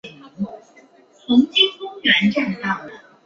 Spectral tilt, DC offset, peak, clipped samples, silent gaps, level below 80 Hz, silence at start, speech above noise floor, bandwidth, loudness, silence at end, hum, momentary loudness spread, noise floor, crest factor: -5 dB/octave; under 0.1%; -2 dBFS; under 0.1%; none; -62 dBFS; 0.05 s; 32 dB; 7.2 kHz; -18 LUFS; 0.3 s; none; 15 LU; -50 dBFS; 18 dB